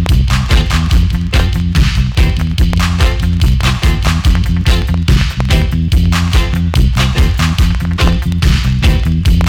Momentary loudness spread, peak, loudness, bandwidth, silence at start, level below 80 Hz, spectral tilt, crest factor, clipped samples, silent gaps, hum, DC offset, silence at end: 2 LU; -2 dBFS; -12 LUFS; 16.5 kHz; 0 s; -12 dBFS; -5.5 dB/octave; 8 dB; under 0.1%; none; none; under 0.1%; 0 s